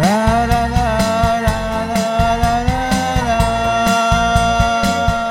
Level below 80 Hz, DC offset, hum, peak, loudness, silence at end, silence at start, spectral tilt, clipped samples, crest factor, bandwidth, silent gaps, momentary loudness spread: -24 dBFS; under 0.1%; none; 0 dBFS; -15 LUFS; 0 s; 0 s; -5 dB/octave; under 0.1%; 14 dB; 16.5 kHz; none; 4 LU